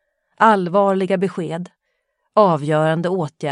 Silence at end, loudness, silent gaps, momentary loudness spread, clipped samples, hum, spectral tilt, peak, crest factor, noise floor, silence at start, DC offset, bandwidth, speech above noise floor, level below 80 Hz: 0 s; -18 LUFS; none; 12 LU; under 0.1%; none; -7 dB/octave; 0 dBFS; 18 dB; -72 dBFS; 0.4 s; under 0.1%; 11 kHz; 55 dB; -68 dBFS